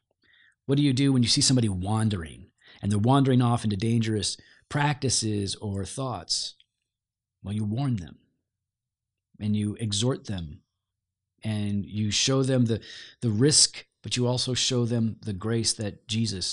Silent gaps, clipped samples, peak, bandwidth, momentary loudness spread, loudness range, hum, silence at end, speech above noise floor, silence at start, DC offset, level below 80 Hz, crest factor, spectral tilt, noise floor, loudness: none; under 0.1%; -6 dBFS; 11 kHz; 14 LU; 9 LU; none; 0 s; 63 dB; 0.7 s; under 0.1%; -56 dBFS; 22 dB; -4.5 dB/octave; -88 dBFS; -26 LUFS